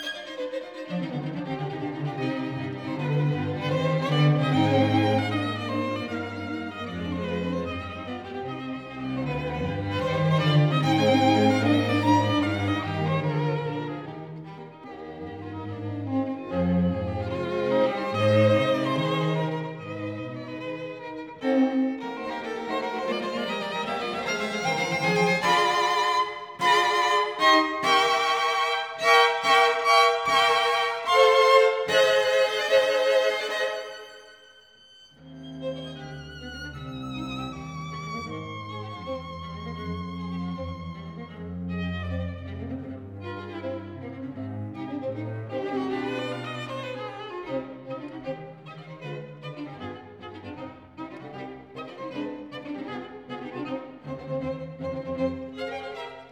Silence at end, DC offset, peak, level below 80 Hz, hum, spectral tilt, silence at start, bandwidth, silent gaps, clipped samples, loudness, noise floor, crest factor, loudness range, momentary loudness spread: 0 s; under 0.1%; -6 dBFS; -56 dBFS; none; -5.5 dB/octave; 0 s; 18 kHz; none; under 0.1%; -25 LUFS; -54 dBFS; 20 dB; 16 LU; 18 LU